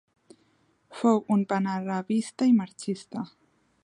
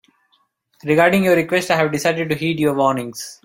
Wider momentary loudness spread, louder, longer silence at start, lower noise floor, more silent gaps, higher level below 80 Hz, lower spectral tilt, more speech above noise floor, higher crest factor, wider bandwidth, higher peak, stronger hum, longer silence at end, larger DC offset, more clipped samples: first, 14 LU vs 9 LU; second, -27 LUFS vs -17 LUFS; about the same, 0.9 s vs 0.85 s; about the same, -67 dBFS vs -64 dBFS; neither; second, -76 dBFS vs -56 dBFS; first, -6.5 dB/octave vs -5 dB/octave; second, 41 dB vs 46 dB; about the same, 18 dB vs 18 dB; second, 11 kHz vs 16.5 kHz; second, -10 dBFS vs 0 dBFS; neither; first, 0.55 s vs 0.1 s; neither; neither